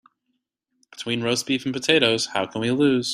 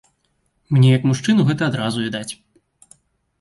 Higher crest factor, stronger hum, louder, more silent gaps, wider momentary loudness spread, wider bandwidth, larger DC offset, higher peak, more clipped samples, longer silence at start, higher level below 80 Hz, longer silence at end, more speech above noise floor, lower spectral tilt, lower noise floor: first, 22 dB vs 16 dB; neither; second, -22 LUFS vs -18 LUFS; neither; second, 8 LU vs 14 LU; first, 15 kHz vs 11.5 kHz; neither; about the same, -2 dBFS vs -4 dBFS; neither; first, 0.95 s vs 0.7 s; second, -64 dBFS vs -58 dBFS; second, 0 s vs 1.05 s; first, 54 dB vs 50 dB; second, -4 dB/octave vs -6.5 dB/octave; first, -76 dBFS vs -67 dBFS